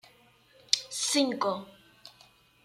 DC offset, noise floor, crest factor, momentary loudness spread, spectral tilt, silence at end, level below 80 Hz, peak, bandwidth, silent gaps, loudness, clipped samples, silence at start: under 0.1%; -61 dBFS; 26 dB; 6 LU; -1.5 dB/octave; 0.55 s; -76 dBFS; -8 dBFS; 15.5 kHz; none; -28 LUFS; under 0.1%; 0.7 s